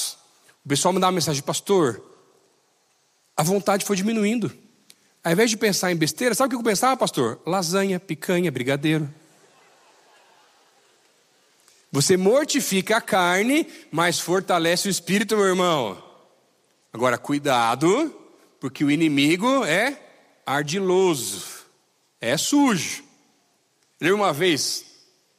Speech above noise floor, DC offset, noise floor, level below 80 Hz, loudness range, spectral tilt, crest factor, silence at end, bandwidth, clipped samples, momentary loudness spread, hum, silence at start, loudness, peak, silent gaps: 44 dB; under 0.1%; -65 dBFS; -70 dBFS; 5 LU; -4 dB/octave; 18 dB; 0.55 s; 15.5 kHz; under 0.1%; 10 LU; none; 0 s; -22 LUFS; -6 dBFS; none